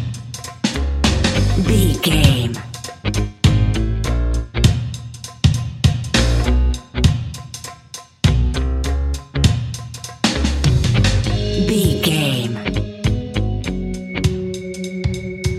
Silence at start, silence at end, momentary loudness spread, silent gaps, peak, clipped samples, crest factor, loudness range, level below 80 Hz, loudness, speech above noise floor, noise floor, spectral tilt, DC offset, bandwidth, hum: 0 s; 0 s; 12 LU; none; 0 dBFS; under 0.1%; 18 dB; 3 LU; -24 dBFS; -19 LUFS; 24 dB; -38 dBFS; -5.5 dB/octave; under 0.1%; 15.5 kHz; none